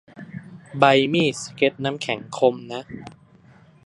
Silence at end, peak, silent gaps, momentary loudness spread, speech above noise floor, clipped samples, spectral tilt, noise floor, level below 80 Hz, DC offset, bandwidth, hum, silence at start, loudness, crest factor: 0.75 s; 0 dBFS; none; 22 LU; 30 dB; under 0.1%; -5 dB/octave; -51 dBFS; -62 dBFS; under 0.1%; 11.5 kHz; none; 0.15 s; -21 LUFS; 22 dB